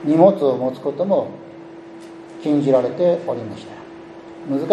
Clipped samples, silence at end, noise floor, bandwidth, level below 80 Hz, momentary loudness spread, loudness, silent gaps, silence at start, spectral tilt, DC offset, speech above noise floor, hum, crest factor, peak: under 0.1%; 0 s; -38 dBFS; 9 kHz; -66 dBFS; 24 LU; -19 LUFS; none; 0 s; -8.5 dB/octave; under 0.1%; 20 dB; none; 20 dB; 0 dBFS